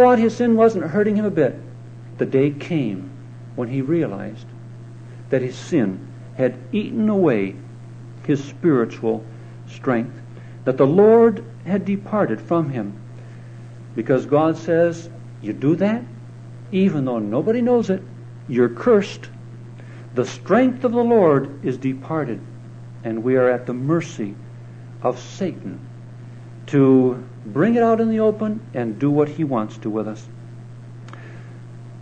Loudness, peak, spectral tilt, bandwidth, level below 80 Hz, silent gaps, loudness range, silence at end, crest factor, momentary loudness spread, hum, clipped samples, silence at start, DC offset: -20 LUFS; -2 dBFS; -8 dB/octave; 8.8 kHz; -60 dBFS; none; 6 LU; 0 s; 18 dB; 22 LU; none; under 0.1%; 0 s; under 0.1%